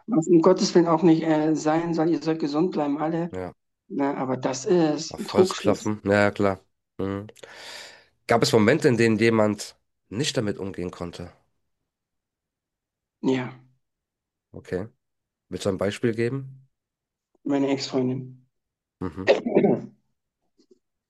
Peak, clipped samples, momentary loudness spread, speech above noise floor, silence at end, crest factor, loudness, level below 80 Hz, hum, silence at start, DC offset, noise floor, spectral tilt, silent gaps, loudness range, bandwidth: -4 dBFS; under 0.1%; 18 LU; 63 dB; 1.2 s; 20 dB; -23 LUFS; -62 dBFS; none; 0.1 s; under 0.1%; -86 dBFS; -5.5 dB/octave; none; 11 LU; 12.5 kHz